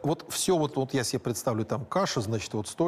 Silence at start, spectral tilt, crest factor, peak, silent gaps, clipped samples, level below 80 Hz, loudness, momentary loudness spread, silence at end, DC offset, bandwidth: 0 s; -4.5 dB/octave; 12 dB; -16 dBFS; none; under 0.1%; -62 dBFS; -29 LUFS; 5 LU; 0 s; under 0.1%; 15.5 kHz